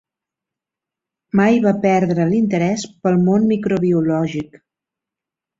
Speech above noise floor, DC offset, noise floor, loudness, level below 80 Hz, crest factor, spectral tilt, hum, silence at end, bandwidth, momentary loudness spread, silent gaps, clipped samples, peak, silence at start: 70 dB; under 0.1%; -86 dBFS; -17 LUFS; -56 dBFS; 16 dB; -7.5 dB/octave; none; 1.15 s; 7.8 kHz; 7 LU; none; under 0.1%; -2 dBFS; 1.35 s